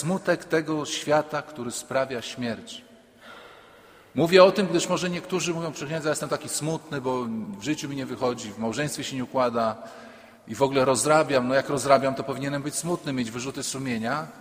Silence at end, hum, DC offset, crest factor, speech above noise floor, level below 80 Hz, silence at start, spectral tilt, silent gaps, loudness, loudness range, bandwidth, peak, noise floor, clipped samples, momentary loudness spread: 0 s; none; under 0.1%; 24 dB; 27 dB; -62 dBFS; 0 s; -4.5 dB/octave; none; -25 LUFS; 6 LU; 16 kHz; -2 dBFS; -52 dBFS; under 0.1%; 12 LU